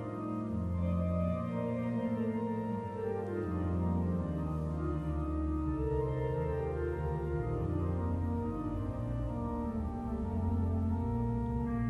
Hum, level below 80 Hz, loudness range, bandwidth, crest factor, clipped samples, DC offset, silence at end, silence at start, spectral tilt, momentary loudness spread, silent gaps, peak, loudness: none; -42 dBFS; 1 LU; 4.4 kHz; 14 dB; under 0.1%; under 0.1%; 0 s; 0 s; -10.5 dB/octave; 4 LU; none; -20 dBFS; -35 LUFS